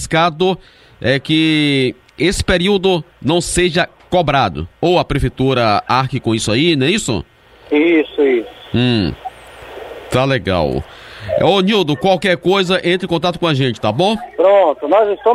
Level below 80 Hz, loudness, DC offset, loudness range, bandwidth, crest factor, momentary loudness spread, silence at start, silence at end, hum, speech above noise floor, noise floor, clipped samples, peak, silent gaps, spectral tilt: -36 dBFS; -15 LUFS; under 0.1%; 3 LU; 14.5 kHz; 14 dB; 9 LU; 0 s; 0 s; none; 20 dB; -35 dBFS; under 0.1%; 0 dBFS; none; -5 dB/octave